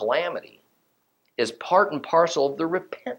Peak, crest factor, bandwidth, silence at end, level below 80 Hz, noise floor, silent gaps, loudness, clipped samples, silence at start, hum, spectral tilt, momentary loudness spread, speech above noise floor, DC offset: -6 dBFS; 20 dB; 16.5 kHz; 0 s; -78 dBFS; -70 dBFS; none; -23 LUFS; under 0.1%; 0 s; none; -4 dB/octave; 10 LU; 46 dB; under 0.1%